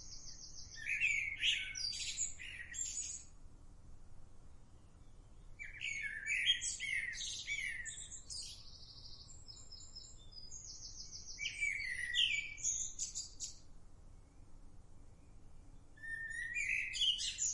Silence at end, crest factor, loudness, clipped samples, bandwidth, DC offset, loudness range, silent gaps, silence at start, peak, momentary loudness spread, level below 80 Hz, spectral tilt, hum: 0 s; 20 dB; -38 LUFS; under 0.1%; 11.5 kHz; under 0.1%; 11 LU; none; 0 s; -22 dBFS; 20 LU; -58 dBFS; 1.5 dB/octave; none